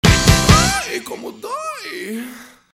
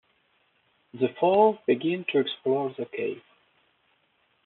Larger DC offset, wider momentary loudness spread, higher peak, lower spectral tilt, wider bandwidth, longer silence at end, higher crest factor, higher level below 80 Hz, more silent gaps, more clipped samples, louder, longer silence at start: neither; first, 18 LU vs 12 LU; first, 0 dBFS vs -8 dBFS; about the same, -4 dB/octave vs -4 dB/octave; first, 18.5 kHz vs 4.2 kHz; second, 0.3 s vs 1.25 s; about the same, 18 dB vs 20 dB; first, -26 dBFS vs -80 dBFS; neither; first, 0.1% vs under 0.1%; first, -16 LUFS vs -26 LUFS; second, 0.05 s vs 0.95 s